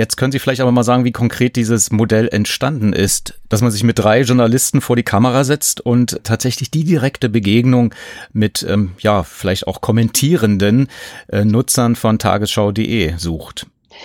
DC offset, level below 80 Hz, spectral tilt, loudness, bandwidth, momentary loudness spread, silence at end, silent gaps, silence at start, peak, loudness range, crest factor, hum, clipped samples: under 0.1%; -40 dBFS; -5 dB/octave; -15 LUFS; 17 kHz; 7 LU; 0 s; none; 0 s; 0 dBFS; 2 LU; 14 dB; none; under 0.1%